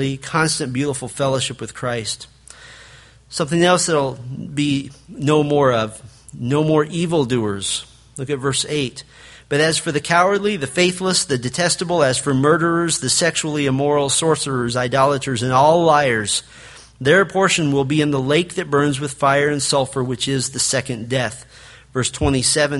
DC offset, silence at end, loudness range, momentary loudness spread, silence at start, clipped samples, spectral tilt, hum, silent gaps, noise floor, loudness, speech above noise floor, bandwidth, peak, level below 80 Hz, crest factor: under 0.1%; 0 s; 4 LU; 10 LU; 0 s; under 0.1%; -4 dB/octave; none; none; -45 dBFS; -18 LUFS; 27 dB; 11.5 kHz; 0 dBFS; -46 dBFS; 18 dB